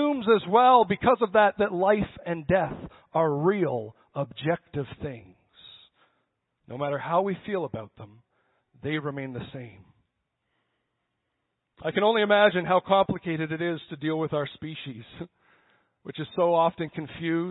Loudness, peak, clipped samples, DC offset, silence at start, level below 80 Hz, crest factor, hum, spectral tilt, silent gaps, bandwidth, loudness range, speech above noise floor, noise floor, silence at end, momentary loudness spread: -25 LUFS; -6 dBFS; under 0.1%; under 0.1%; 0 s; -58 dBFS; 20 dB; none; -10.5 dB/octave; none; 4.1 kHz; 13 LU; 54 dB; -80 dBFS; 0 s; 20 LU